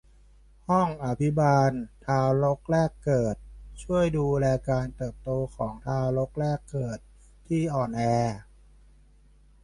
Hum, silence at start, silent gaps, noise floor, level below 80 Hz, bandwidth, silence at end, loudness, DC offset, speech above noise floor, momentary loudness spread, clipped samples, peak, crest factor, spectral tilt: none; 0.7 s; none; -56 dBFS; -48 dBFS; 11.5 kHz; 1.2 s; -27 LUFS; under 0.1%; 31 dB; 12 LU; under 0.1%; -10 dBFS; 16 dB; -8 dB/octave